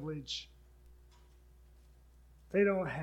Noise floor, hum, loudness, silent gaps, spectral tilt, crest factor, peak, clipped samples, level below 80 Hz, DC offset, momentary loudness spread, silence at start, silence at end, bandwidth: -61 dBFS; none; -34 LUFS; none; -5.5 dB/octave; 22 dB; -16 dBFS; under 0.1%; -60 dBFS; under 0.1%; 13 LU; 0 s; 0 s; 9.6 kHz